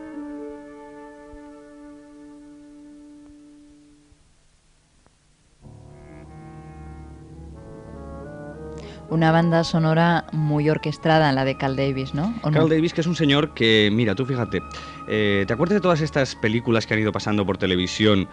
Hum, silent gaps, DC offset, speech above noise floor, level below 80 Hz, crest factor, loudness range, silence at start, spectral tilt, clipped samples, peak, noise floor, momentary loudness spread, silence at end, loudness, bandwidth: none; none; under 0.1%; 38 dB; -48 dBFS; 20 dB; 20 LU; 0 s; -6.5 dB/octave; under 0.1%; -4 dBFS; -59 dBFS; 24 LU; 0 s; -21 LUFS; 10 kHz